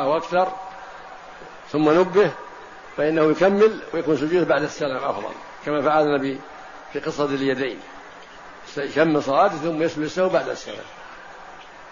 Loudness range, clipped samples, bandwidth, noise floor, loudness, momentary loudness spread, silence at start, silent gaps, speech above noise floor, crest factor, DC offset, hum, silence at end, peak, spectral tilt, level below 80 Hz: 4 LU; under 0.1%; 7.4 kHz; -42 dBFS; -21 LUFS; 22 LU; 0 s; none; 21 dB; 18 dB; 0.2%; none; 0 s; -6 dBFS; -6 dB/octave; -58 dBFS